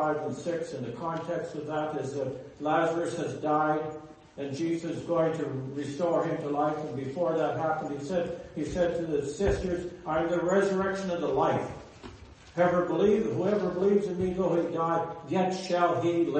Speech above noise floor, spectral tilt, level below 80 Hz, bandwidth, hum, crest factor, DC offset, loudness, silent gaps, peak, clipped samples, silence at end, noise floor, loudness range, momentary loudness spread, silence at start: 20 dB; -6.5 dB/octave; -52 dBFS; 8.8 kHz; none; 18 dB; under 0.1%; -29 LUFS; none; -12 dBFS; under 0.1%; 0 s; -49 dBFS; 3 LU; 10 LU; 0 s